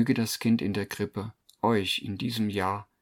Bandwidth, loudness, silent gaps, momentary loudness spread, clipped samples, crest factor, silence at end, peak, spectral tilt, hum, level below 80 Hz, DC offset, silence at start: 18 kHz; -29 LUFS; none; 7 LU; under 0.1%; 18 dB; 0.2 s; -10 dBFS; -5 dB/octave; none; -64 dBFS; under 0.1%; 0 s